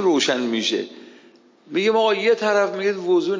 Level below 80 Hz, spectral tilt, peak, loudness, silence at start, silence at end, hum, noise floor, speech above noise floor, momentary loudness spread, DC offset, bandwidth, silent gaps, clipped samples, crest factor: -80 dBFS; -3.5 dB/octave; -8 dBFS; -20 LUFS; 0 s; 0 s; none; -51 dBFS; 32 dB; 8 LU; under 0.1%; 7.6 kHz; none; under 0.1%; 14 dB